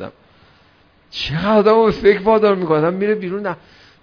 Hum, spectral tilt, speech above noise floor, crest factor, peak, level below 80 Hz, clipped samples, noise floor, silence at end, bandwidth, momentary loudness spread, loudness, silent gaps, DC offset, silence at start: none; -7.5 dB/octave; 37 dB; 16 dB; 0 dBFS; -46 dBFS; under 0.1%; -53 dBFS; 0.45 s; 5.4 kHz; 15 LU; -16 LUFS; none; under 0.1%; 0 s